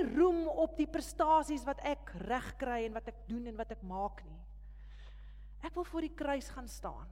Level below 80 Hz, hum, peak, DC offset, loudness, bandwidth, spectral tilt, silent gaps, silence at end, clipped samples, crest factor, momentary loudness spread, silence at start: -50 dBFS; 50 Hz at -50 dBFS; -18 dBFS; under 0.1%; -36 LUFS; 16.5 kHz; -5.5 dB/octave; none; 0 s; under 0.1%; 18 dB; 24 LU; 0 s